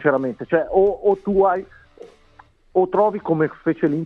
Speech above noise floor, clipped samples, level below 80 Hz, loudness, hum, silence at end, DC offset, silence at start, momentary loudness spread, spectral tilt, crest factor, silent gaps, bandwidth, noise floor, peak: 33 dB; under 0.1%; -50 dBFS; -20 LUFS; none; 0 s; under 0.1%; 0 s; 5 LU; -10 dB/octave; 18 dB; none; 4.1 kHz; -52 dBFS; -2 dBFS